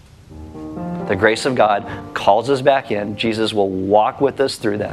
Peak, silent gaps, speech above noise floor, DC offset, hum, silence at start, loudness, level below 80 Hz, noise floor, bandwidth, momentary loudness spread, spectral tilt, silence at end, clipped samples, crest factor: 0 dBFS; none; 21 dB; under 0.1%; none; 0.3 s; -18 LUFS; -50 dBFS; -38 dBFS; 13.5 kHz; 12 LU; -5 dB/octave; 0 s; under 0.1%; 18 dB